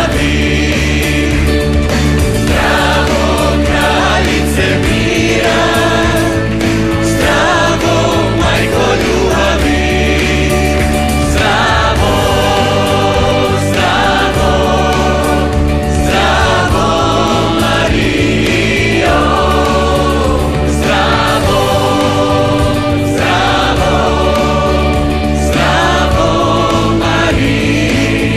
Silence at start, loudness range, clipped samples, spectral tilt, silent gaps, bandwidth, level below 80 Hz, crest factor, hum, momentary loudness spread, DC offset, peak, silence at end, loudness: 0 s; 1 LU; under 0.1%; -5 dB/octave; none; 14 kHz; -20 dBFS; 10 dB; none; 2 LU; 2%; 0 dBFS; 0 s; -11 LUFS